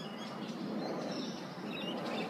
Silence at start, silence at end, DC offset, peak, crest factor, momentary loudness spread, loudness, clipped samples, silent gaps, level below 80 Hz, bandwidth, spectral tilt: 0 s; 0 s; under 0.1%; -26 dBFS; 14 dB; 4 LU; -40 LUFS; under 0.1%; none; -84 dBFS; 15.5 kHz; -5 dB/octave